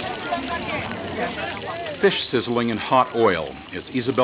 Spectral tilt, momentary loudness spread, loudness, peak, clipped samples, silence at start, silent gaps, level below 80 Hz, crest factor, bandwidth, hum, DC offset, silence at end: -9.5 dB/octave; 9 LU; -23 LUFS; -4 dBFS; under 0.1%; 0 s; none; -50 dBFS; 20 dB; 4 kHz; none; under 0.1%; 0 s